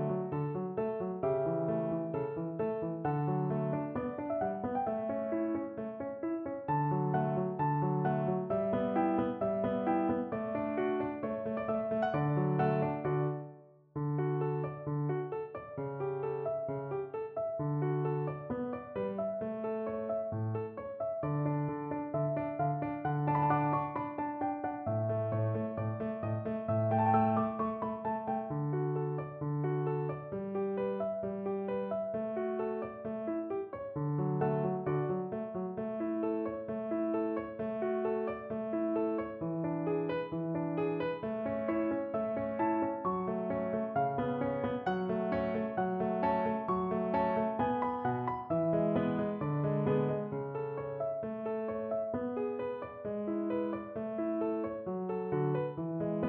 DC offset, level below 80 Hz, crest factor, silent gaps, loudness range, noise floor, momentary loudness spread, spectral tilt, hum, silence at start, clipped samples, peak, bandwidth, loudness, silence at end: under 0.1%; -64 dBFS; 16 dB; none; 4 LU; -54 dBFS; 7 LU; -8.5 dB/octave; none; 0 s; under 0.1%; -18 dBFS; 4.4 kHz; -34 LUFS; 0 s